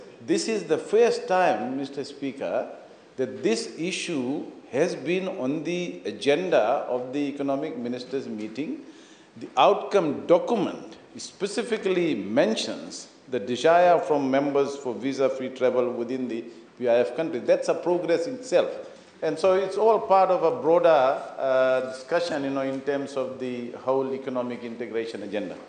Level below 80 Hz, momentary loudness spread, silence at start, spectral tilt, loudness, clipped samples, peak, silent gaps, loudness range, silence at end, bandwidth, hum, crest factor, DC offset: -78 dBFS; 12 LU; 0 s; -5 dB/octave; -25 LUFS; under 0.1%; -6 dBFS; none; 6 LU; 0 s; 9.6 kHz; none; 18 dB; under 0.1%